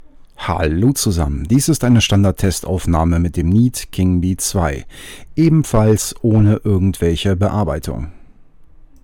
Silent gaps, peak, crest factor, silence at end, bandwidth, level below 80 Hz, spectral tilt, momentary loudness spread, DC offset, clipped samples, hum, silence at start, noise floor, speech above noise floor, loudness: none; -2 dBFS; 12 dB; 0.4 s; 18 kHz; -30 dBFS; -6 dB/octave; 10 LU; under 0.1%; under 0.1%; none; 0.05 s; -41 dBFS; 26 dB; -16 LUFS